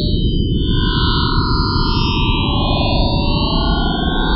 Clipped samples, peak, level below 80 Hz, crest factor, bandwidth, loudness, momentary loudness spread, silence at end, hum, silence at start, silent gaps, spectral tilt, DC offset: under 0.1%; -4 dBFS; -20 dBFS; 12 dB; 5.8 kHz; -16 LUFS; 2 LU; 0 s; none; 0 s; none; -10 dB/octave; under 0.1%